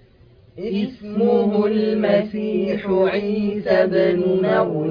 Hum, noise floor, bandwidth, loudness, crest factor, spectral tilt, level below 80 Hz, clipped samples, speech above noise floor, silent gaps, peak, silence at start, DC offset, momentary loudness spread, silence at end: none; -50 dBFS; 5.2 kHz; -19 LUFS; 14 dB; -9 dB/octave; -54 dBFS; under 0.1%; 31 dB; none; -4 dBFS; 0.55 s; under 0.1%; 7 LU; 0 s